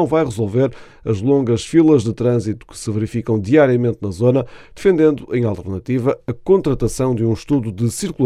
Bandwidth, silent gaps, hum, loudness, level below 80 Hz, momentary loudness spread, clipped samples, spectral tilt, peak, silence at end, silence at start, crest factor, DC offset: 13.5 kHz; none; none; -17 LUFS; -42 dBFS; 9 LU; under 0.1%; -7 dB/octave; 0 dBFS; 0 s; 0 s; 16 dB; under 0.1%